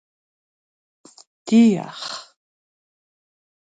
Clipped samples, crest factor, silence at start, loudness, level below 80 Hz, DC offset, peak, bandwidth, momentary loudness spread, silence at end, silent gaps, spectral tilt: under 0.1%; 20 dB; 1.45 s; -19 LUFS; -72 dBFS; under 0.1%; -6 dBFS; 9.2 kHz; 20 LU; 1.6 s; none; -5.5 dB/octave